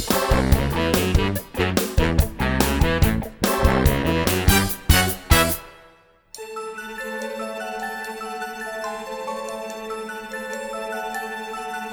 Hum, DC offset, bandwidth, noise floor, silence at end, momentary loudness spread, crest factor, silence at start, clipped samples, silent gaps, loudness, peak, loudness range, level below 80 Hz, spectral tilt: none; under 0.1%; over 20 kHz; -53 dBFS; 0 s; 13 LU; 22 dB; 0 s; under 0.1%; none; -22 LUFS; 0 dBFS; 11 LU; -28 dBFS; -4.5 dB/octave